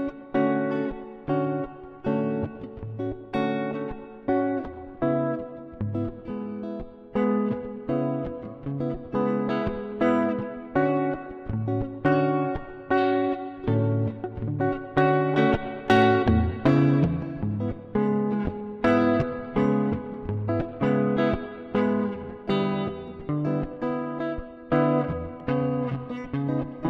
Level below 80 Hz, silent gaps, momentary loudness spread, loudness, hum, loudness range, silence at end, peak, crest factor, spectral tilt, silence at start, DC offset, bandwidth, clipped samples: -46 dBFS; none; 12 LU; -26 LUFS; none; 7 LU; 0 s; -8 dBFS; 18 dB; -9 dB/octave; 0 s; under 0.1%; 7.2 kHz; under 0.1%